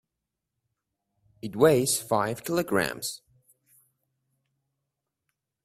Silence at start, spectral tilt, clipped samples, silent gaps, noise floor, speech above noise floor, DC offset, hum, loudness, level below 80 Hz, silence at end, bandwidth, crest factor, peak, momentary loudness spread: 1.45 s; -4 dB/octave; under 0.1%; none; -85 dBFS; 60 dB; under 0.1%; none; -25 LUFS; -66 dBFS; 2.5 s; 16 kHz; 24 dB; -6 dBFS; 17 LU